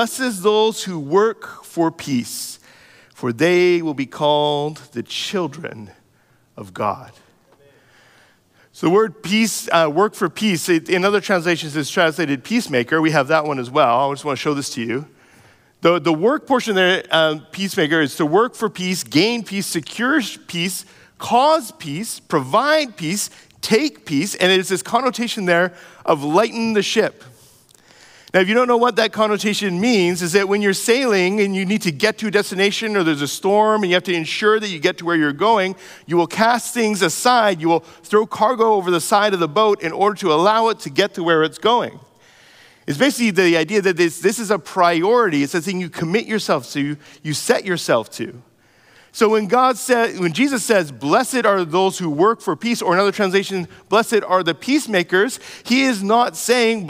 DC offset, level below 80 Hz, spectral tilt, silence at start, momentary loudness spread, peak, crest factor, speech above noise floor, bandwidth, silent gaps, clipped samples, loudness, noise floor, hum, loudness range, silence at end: under 0.1%; -68 dBFS; -4 dB/octave; 0 s; 9 LU; -2 dBFS; 16 dB; 39 dB; 16 kHz; none; under 0.1%; -18 LUFS; -57 dBFS; none; 4 LU; 0 s